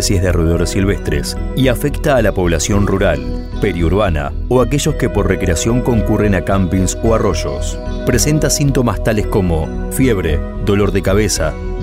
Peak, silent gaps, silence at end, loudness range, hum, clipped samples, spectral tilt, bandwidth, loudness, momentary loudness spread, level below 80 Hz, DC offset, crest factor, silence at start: 0 dBFS; none; 0 s; 1 LU; none; under 0.1%; -5.5 dB/octave; 16 kHz; -15 LUFS; 6 LU; -22 dBFS; under 0.1%; 14 dB; 0 s